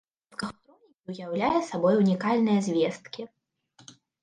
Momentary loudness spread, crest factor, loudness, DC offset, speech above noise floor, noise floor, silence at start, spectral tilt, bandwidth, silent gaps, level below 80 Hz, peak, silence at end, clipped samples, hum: 18 LU; 16 dB; -26 LUFS; under 0.1%; 37 dB; -62 dBFS; 0.4 s; -6.5 dB/octave; 9.8 kHz; 1.00-1.04 s; -66 dBFS; -12 dBFS; 0.3 s; under 0.1%; none